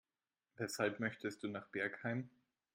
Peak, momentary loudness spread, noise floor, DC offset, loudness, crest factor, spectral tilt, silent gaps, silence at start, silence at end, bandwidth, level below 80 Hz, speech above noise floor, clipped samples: -22 dBFS; 8 LU; under -90 dBFS; under 0.1%; -42 LUFS; 22 dB; -5 dB/octave; none; 0.6 s; 0.45 s; 16 kHz; -84 dBFS; over 48 dB; under 0.1%